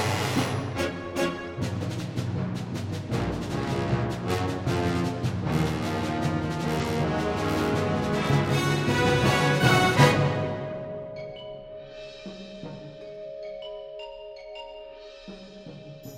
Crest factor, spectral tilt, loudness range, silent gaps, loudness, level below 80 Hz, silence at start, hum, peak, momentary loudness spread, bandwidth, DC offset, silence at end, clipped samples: 24 dB; -5.5 dB/octave; 17 LU; none; -26 LUFS; -46 dBFS; 0 s; none; -4 dBFS; 20 LU; 16 kHz; under 0.1%; 0 s; under 0.1%